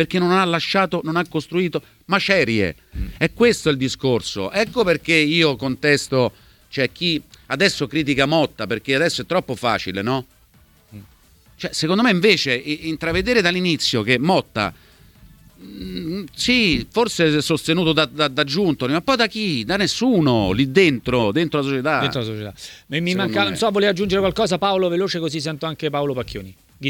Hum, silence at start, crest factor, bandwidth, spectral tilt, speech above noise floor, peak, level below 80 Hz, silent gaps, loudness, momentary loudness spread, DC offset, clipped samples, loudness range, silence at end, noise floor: none; 0 s; 18 dB; 19 kHz; -5 dB/octave; 34 dB; -2 dBFS; -44 dBFS; none; -19 LUFS; 10 LU; under 0.1%; under 0.1%; 3 LU; 0 s; -53 dBFS